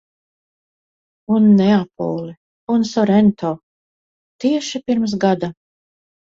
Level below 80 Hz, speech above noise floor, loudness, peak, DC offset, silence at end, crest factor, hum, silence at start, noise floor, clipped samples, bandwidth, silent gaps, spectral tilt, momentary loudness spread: -58 dBFS; over 74 dB; -17 LUFS; -2 dBFS; under 0.1%; 0.85 s; 16 dB; none; 1.3 s; under -90 dBFS; under 0.1%; 7.6 kHz; 2.37-2.67 s, 3.63-4.39 s; -7 dB/octave; 15 LU